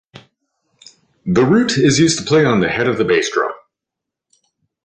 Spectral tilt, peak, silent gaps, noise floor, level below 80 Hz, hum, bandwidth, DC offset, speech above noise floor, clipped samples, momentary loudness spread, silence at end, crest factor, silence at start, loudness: -5 dB/octave; -2 dBFS; none; -83 dBFS; -50 dBFS; none; 9.8 kHz; under 0.1%; 69 dB; under 0.1%; 9 LU; 1.3 s; 16 dB; 1.25 s; -15 LUFS